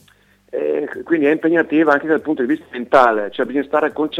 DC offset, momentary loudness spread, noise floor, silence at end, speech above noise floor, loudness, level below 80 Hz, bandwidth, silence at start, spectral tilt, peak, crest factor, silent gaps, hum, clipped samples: under 0.1%; 9 LU; -54 dBFS; 0 s; 37 dB; -17 LUFS; -60 dBFS; 8.8 kHz; 0.55 s; -6.5 dB/octave; 0 dBFS; 18 dB; none; none; under 0.1%